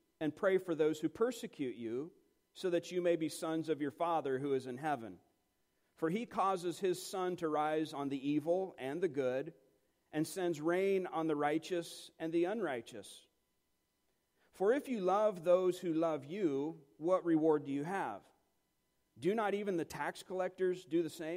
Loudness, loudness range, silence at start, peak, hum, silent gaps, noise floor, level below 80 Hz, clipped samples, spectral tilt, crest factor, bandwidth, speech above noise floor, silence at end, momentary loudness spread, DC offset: -37 LUFS; 4 LU; 0.2 s; -18 dBFS; none; none; -82 dBFS; -82 dBFS; under 0.1%; -6 dB/octave; 18 dB; 16 kHz; 46 dB; 0 s; 9 LU; under 0.1%